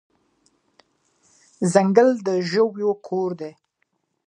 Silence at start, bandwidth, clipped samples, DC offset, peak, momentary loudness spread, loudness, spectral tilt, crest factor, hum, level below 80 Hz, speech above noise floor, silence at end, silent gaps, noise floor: 1.6 s; 10.5 kHz; under 0.1%; under 0.1%; 0 dBFS; 11 LU; -20 LUFS; -6 dB/octave; 22 dB; none; -74 dBFS; 53 dB; 0.75 s; none; -72 dBFS